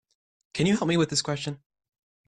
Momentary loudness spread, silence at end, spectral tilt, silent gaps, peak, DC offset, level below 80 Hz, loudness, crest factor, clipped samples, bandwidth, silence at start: 13 LU; 0.7 s; -4.5 dB/octave; none; -12 dBFS; under 0.1%; -60 dBFS; -26 LUFS; 16 dB; under 0.1%; 11 kHz; 0.55 s